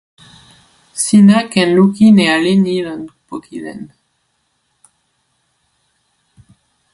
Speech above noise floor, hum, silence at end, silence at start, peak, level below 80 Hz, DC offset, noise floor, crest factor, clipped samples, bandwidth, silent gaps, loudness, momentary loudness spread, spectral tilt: 53 dB; none; 3.1 s; 0.95 s; 0 dBFS; -56 dBFS; under 0.1%; -65 dBFS; 14 dB; under 0.1%; 11.5 kHz; none; -11 LUFS; 21 LU; -5.5 dB/octave